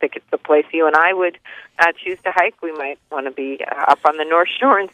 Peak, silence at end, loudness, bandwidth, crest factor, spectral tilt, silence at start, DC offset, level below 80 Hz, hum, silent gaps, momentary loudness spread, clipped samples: 0 dBFS; 0.05 s; -17 LUFS; 11 kHz; 18 dB; -3.5 dB/octave; 0 s; under 0.1%; -68 dBFS; none; none; 12 LU; under 0.1%